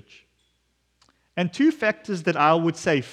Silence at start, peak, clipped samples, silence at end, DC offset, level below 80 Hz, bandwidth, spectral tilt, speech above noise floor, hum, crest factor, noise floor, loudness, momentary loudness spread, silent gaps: 1.35 s; -6 dBFS; under 0.1%; 0 s; under 0.1%; -68 dBFS; 10.5 kHz; -6 dB/octave; 48 dB; none; 20 dB; -70 dBFS; -22 LUFS; 9 LU; none